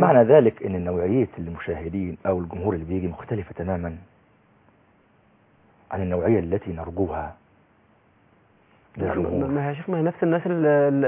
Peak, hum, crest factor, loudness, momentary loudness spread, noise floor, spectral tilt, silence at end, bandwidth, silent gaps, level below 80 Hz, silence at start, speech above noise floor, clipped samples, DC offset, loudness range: -2 dBFS; none; 20 dB; -24 LUFS; 13 LU; -59 dBFS; -12 dB/octave; 0 s; 3.6 kHz; none; -44 dBFS; 0 s; 37 dB; under 0.1%; under 0.1%; 7 LU